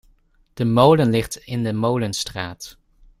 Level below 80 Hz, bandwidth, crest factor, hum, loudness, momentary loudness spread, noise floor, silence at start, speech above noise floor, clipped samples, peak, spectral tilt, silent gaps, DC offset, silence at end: -48 dBFS; 15.5 kHz; 18 dB; none; -20 LUFS; 17 LU; -58 dBFS; 0.55 s; 39 dB; under 0.1%; -2 dBFS; -6 dB/octave; none; under 0.1%; 0.5 s